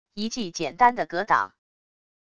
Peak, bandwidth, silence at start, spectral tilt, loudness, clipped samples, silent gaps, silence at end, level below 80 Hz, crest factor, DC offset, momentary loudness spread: -6 dBFS; 10 kHz; 0.15 s; -3.5 dB/octave; -24 LUFS; under 0.1%; none; 0.8 s; -60 dBFS; 20 dB; under 0.1%; 10 LU